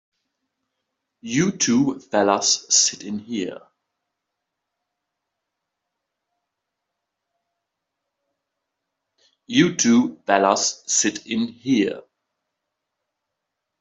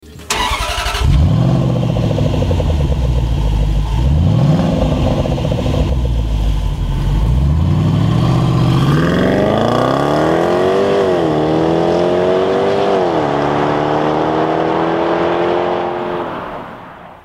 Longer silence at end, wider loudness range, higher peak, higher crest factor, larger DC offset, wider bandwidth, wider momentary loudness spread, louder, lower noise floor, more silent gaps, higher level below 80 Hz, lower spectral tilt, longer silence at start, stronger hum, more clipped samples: first, 1.8 s vs 0.1 s; first, 8 LU vs 3 LU; about the same, -2 dBFS vs -2 dBFS; first, 22 dB vs 12 dB; neither; second, 8.2 kHz vs 15.5 kHz; first, 12 LU vs 5 LU; second, -20 LUFS vs -15 LUFS; first, -81 dBFS vs -34 dBFS; neither; second, -68 dBFS vs -22 dBFS; second, -3 dB/octave vs -7 dB/octave; first, 1.25 s vs 0.05 s; neither; neither